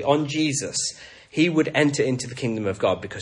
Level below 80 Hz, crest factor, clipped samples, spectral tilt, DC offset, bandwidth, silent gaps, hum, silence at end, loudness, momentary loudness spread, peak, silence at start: -62 dBFS; 18 dB; under 0.1%; -4.5 dB/octave; under 0.1%; 11.5 kHz; none; none; 0 s; -23 LUFS; 8 LU; -4 dBFS; 0 s